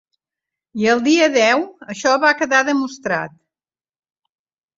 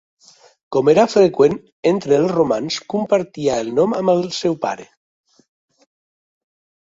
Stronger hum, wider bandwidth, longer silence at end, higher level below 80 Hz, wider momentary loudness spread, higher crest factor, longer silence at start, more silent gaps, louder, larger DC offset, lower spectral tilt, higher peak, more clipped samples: neither; about the same, 7.8 kHz vs 7.8 kHz; second, 1.5 s vs 2 s; second, -64 dBFS vs -58 dBFS; about the same, 11 LU vs 9 LU; about the same, 18 dB vs 16 dB; about the same, 0.75 s vs 0.7 s; second, none vs 1.72-1.83 s; about the same, -16 LUFS vs -17 LUFS; neither; second, -3 dB/octave vs -5.5 dB/octave; about the same, -2 dBFS vs -2 dBFS; neither